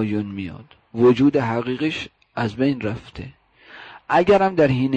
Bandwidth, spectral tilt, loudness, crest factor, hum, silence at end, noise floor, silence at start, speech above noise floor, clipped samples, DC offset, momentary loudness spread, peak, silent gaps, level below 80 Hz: 8.6 kHz; -7.5 dB/octave; -20 LUFS; 14 dB; none; 0 s; -45 dBFS; 0 s; 25 dB; under 0.1%; under 0.1%; 22 LU; -6 dBFS; none; -50 dBFS